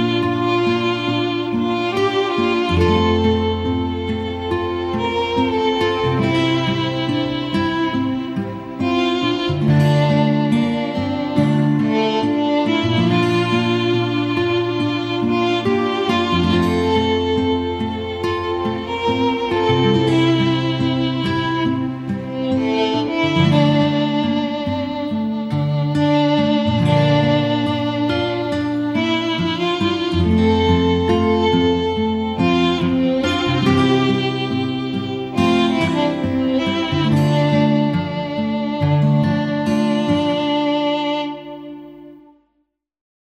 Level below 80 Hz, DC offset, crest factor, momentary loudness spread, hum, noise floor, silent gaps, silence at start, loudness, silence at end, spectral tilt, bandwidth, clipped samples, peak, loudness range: -46 dBFS; under 0.1%; 14 dB; 7 LU; none; -69 dBFS; none; 0 s; -18 LUFS; 1.05 s; -7 dB/octave; 11.5 kHz; under 0.1%; -2 dBFS; 2 LU